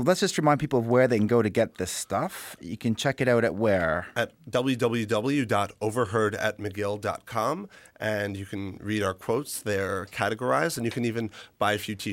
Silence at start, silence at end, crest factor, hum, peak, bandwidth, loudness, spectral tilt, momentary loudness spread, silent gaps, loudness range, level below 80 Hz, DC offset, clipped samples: 0 s; 0 s; 18 dB; none; -8 dBFS; 16.5 kHz; -27 LUFS; -5 dB/octave; 9 LU; none; 5 LU; -60 dBFS; under 0.1%; under 0.1%